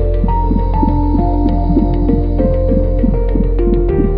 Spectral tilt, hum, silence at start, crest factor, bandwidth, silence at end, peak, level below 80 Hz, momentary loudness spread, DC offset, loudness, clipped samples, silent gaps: -13 dB/octave; none; 0 s; 10 dB; 4.2 kHz; 0 s; -2 dBFS; -14 dBFS; 2 LU; under 0.1%; -15 LUFS; under 0.1%; none